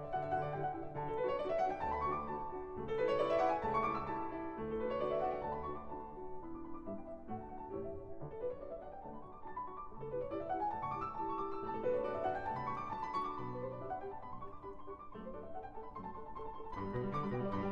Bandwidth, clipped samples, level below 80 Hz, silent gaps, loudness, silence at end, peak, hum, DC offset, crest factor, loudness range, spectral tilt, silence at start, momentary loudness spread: 8.4 kHz; under 0.1%; -58 dBFS; none; -41 LUFS; 0 s; -22 dBFS; none; under 0.1%; 18 dB; 10 LU; -8 dB/octave; 0 s; 13 LU